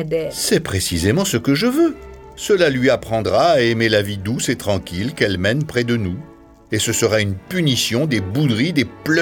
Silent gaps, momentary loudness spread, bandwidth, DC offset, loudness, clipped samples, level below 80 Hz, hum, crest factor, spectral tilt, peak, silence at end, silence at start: none; 7 LU; 19 kHz; under 0.1%; -18 LUFS; under 0.1%; -44 dBFS; none; 18 dB; -4.5 dB/octave; 0 dBFS; 0 s; 0 s